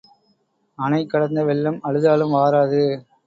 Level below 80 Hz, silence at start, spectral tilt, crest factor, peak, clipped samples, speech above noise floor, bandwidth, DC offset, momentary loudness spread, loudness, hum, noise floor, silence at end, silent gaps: -64 dBFS; 0.8 s; -8.5 dB/octave; 16 dB; -4 dBFS; under 0.1%; 47 dB; 7.6 kHz; under 0.1%; 5 LU; -19 LUFS; none; -65 dBFS; 0.25 s; none